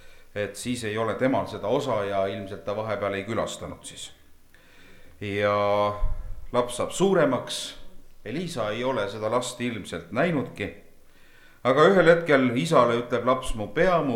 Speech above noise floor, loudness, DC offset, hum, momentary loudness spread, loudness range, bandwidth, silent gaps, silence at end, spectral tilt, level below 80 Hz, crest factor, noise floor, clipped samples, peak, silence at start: 27 dB; -25 LUFS; under 0.1%; none; 15 LU; 7 LU; 16 kHz; none; 0 s; -5 dB/octave; -40 dBFS; 22 dB; -51 dBFS; under 0.1%; -4 dBFS; 0.05 s